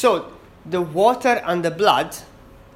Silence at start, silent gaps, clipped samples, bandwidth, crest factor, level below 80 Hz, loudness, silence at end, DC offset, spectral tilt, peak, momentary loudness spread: 0 s; none; under 0.1%; 16.5 kHz; 20 dB; -54 dBFS; -20 LUFS; 0.5 s; under 0.1%; -4.5 dB/octave; 0 dBFS; 12 LU